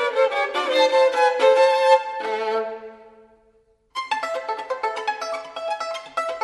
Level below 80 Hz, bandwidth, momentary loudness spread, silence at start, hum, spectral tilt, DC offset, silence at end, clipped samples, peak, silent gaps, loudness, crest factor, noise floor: -70 dBFS; 11.5 kHz; 13 LU; 0 s; none; -1 dB/octave; under 0.1%; 0 s; under 0.1%; -4 dBFS; none; -21 LUFS; 18 dB; -60 dBFS